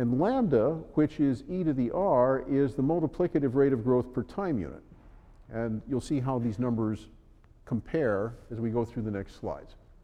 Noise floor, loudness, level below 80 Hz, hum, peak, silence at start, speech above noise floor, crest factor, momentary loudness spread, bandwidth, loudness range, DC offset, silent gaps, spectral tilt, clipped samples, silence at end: -56 dBFS; -29 LUFS; -52 dBFS; none; -12 dBFS; 0 s; 28 dB; 16 dB; 11 LU; 10 kHz; 6 LU; under 0.1%; none; -9 dB/octave; under 0.1%; 0.3 s